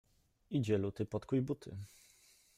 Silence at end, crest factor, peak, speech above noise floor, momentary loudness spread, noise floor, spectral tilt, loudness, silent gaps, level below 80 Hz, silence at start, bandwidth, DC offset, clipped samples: 0.7 s; 18 dB; -22 dBFS; 30 dB; 15 LU; -67 dBFS; -8 dB/octave; -38 LUFS; none; -68 dBFS; 0.5 s; 15.5 kHz; under 0.1%; under 0.1%